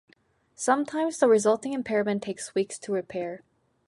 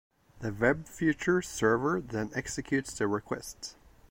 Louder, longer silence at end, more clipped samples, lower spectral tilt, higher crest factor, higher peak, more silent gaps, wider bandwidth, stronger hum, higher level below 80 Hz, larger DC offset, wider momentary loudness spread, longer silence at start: first, -27 LUFS vs -31 LUFS; first, 0.5 s vs 0.35 s; neither; about the same, -4.5 dB/octave vs -5 dB/octave; about the same, 20 dB vs 20 dB; first, -8 dBFS vs -12 dBFS; neither; second, 11.5 kHz vs 16.5 kHz; neither; second, -72 dBFS vs -56 dBFS; neither; about the same, 13 LU vs 12 LU; first, 0.6 s vs 0.35 s